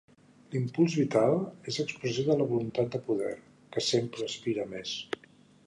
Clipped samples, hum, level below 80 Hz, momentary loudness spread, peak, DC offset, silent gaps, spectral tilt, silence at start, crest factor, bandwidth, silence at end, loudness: under 0.1%; none; -70 dBFS; 11 LU; -12 dBFS; under 0.1%; none; -5.5 dB/octave; 0.5 s; 20 dB; 11 kHz; 0.5 s; -30 LUFS